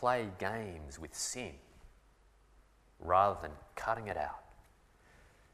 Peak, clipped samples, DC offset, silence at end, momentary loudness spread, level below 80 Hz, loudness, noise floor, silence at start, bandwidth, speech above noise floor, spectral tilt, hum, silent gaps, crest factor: -14 dBFS; under 0.1%; under 0.1%; 1 s; 18 LU; -58 dBFS; -36 LUFS; -66 dBFS; 0 s; 15.5 kHz; 30 dB; -3.5 dB/octave; none; none; 24 dB